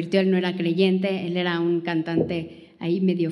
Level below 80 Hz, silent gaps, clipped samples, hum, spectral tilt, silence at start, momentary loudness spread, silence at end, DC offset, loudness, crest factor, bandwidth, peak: -64 dBFS; none; under 0.1%; none; -8 dB/octave; 0 s; 7 LU; 0 s; under 0.1%; -23 LUFS; 16 dB; 10.5 kHz; -6 dBFS